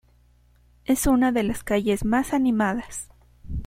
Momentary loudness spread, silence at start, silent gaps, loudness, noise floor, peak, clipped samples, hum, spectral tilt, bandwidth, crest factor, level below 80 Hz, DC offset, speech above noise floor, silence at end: 16 LU; 0.9 s; none; -23 LUFS; -58 dBFS; -8 dBFS; under 0.1%; 60 Hz at -45 dBFS; -5 dB/octave; 16 kHz; 16 dB; -40 dBFS; under 0.1%; 36 dB; 0 s